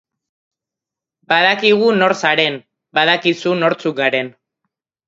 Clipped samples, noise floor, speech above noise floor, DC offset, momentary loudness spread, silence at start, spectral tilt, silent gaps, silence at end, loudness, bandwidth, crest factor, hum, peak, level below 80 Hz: under 0.1%; -86 dBFS; 71 dB; under 0.1%; 8 LU; 1.3 s; -4.5 dB/octave; none; 0.75 s; -15 LUFS; 7.8 kHz; 18 dB; none; 0 dBFS; -68 dBFS